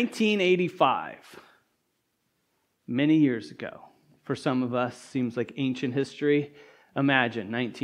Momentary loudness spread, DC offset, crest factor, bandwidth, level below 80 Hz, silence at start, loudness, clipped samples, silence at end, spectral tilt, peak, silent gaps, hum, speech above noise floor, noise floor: 15 LU; under 0.1%; 22 dB; 12 kHz; -76 dBFS; 0 s; -26 LUFS; under 0.1%; 0 s; -6 dB/octave; -6 dBFS; none; none; 49 dB; -76 dBFS